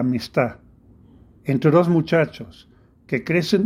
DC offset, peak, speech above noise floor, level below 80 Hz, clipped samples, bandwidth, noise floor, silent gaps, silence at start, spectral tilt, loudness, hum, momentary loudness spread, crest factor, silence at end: under 0.1%; -4 dBFS; 30 dB; -56 dBFS; under 0.1%; 15.5 kHz; -50 dBFS; none; 0 s; -7 dB/octave; -20 LUFS; none; 14 LU; 18 dB; 0 s